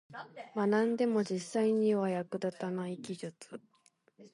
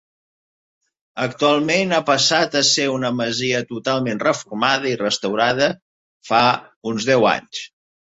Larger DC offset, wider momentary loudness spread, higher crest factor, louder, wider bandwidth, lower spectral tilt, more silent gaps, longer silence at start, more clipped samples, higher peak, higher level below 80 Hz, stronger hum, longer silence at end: neither; first, 18 LU vs 10 LU; about the same, 16 dB vs 18 dB; second, -33 LUFS vs -18 LUFS; first, 11.5 kHz vs 8.2 kHz; first, -6.5 dB/octave vs -3 dB/octave; second, none vs 5.82-6.21 s, 6.76-6.81 s; second, 0.1 s vs 1.15 s; neither; second, -18 dBFS vs -2 dBFS; second, -82 dBFS vs -60 dBFS; neither; second, 0.05 s vs 0.45 s